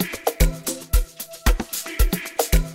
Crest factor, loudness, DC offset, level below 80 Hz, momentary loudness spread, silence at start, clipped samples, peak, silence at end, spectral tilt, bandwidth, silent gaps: 18 dB; -24 LUFS; under 0.1%; -22 dBFS; 5 LU; 0 s; under 0.1%; -4 dBFS; 0 s; -4 dB/octave; 16.5 kHz; none